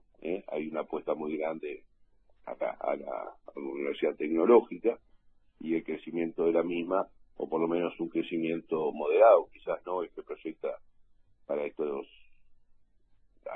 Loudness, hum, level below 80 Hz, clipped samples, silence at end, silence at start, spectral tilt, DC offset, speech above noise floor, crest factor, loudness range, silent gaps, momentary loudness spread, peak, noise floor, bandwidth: -31 LUFS; none; -66 dBFS; under 0.1%; 0 s; 0.2 s; -9.5 dB/octave; under 0.1%; 35 dB; 22 dB; 9 LU; none; 18 LU; -10 dBFS; -65 dBFS; 3.9 kHz